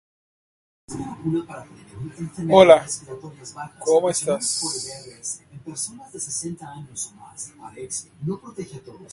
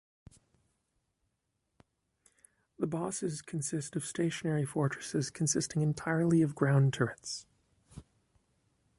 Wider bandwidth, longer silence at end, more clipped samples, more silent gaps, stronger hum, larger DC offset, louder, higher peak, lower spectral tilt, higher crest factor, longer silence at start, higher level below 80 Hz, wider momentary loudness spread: about the same, 11.5 kHz vs 11.5 kHz; second, 0 s vs 1 s; neither; neither; neither; neither; first, -22 LUFS vs -32 LUFS; first, 0 dBFS vs -14 dBFS; second, -4 dB/octave vs -5.5 dB/octave; about the same, 24 dB vs 20 dB; second, 0.9 s vs 2.8 s; first, -58 dBFS vs -68 dBFS; first, 21 LU vs 9 LU